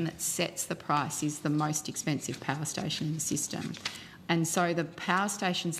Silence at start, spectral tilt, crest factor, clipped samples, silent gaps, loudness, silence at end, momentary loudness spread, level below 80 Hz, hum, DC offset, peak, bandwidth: 0 s; -3.5 dB/octave; 22 dB; under 0.1%; none; -31 LUFS; 0 s; 6 LU; -68 dBFS; none; under 0.1%; -10 dBFS; 16 kHz